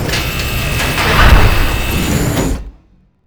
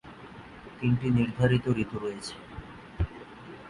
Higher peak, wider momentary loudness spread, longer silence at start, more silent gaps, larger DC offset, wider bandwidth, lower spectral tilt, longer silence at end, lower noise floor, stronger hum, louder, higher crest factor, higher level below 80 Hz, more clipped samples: first, 0 dBFS vs -10 dBFS; second, 8 LU vs 21 LU; about the same, 0 s vs 0.05 s; neither; neither; first, over 20 kHz vs 11 kHz; second, -4.5 dB/octave vs -7.5 dB/octave; first, 0.55 s vs 0 s; about the same, -49 dBFS vs -47 dBFS; neither; first, -13 LUFS vs -29 LUFS; second, 12 dB vs 20 dB; first, -16 dBFS vs -44 dBFS; first, 0.4% vs under 0.1%